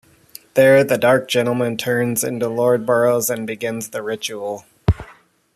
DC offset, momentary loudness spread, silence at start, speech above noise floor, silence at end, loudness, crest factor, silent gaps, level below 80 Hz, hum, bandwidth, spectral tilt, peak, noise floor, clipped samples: under 0.1%; 12 LU; 0.55 s; 31 dB; 0.45 s; -18 LUFS; 16 dB; none; -38 dBFS; none; 14.5 kHz; -4.5 dB/octave; -2 dBFS; -49 dBFS; under 0.1%